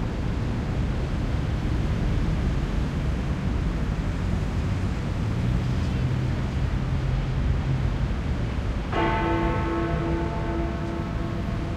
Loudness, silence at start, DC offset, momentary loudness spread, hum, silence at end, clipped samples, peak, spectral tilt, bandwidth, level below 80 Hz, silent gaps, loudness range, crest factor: -27 LUFS; 0 s; under 0.1%; 3 LU; none; 0 s; under 0.1%; -12 dBFS; -7.5 dB/octave; 10 kHz; -30 dBFS; none; 1 LU; 14 dB